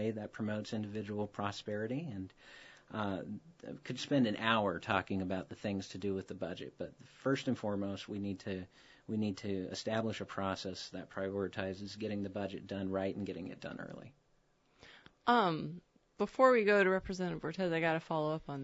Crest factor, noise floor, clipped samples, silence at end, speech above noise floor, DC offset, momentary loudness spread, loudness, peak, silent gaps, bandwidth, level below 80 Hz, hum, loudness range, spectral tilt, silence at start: 22 dB; -73 dBFS; under 0.1%; 0 s; 36 dB; under 0.1%; 16 LU; -37 LUFS; -14 dBFS; none; 7.6 kHz; -68 dBFS; none; 8 LU; -4.5 dB/octave; 0 s